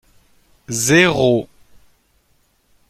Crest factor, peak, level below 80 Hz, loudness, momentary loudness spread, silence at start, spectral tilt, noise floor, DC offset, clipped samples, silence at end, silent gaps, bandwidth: 20 dB; 0 dBFS; -50 dBFS; -15 LUFS; 14 LU; 0.7 s; -4 dB/octave; -60 dBFS; under 0.1%; under 0.1%; 1.45 s; none; 16 kHz